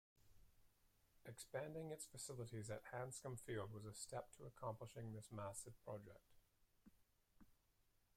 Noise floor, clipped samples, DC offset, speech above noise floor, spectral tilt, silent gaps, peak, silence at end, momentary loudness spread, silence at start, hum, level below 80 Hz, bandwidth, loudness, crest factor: -81 dBFS; under 0.1%; under 0.1%; 28 dB; -4.5 dB/octave; none; -36 dBFS; 0.65 s; 6 LU; 0.15 s; none; -76 dBFS; 16 kHz; -53 LUFS; 18 dB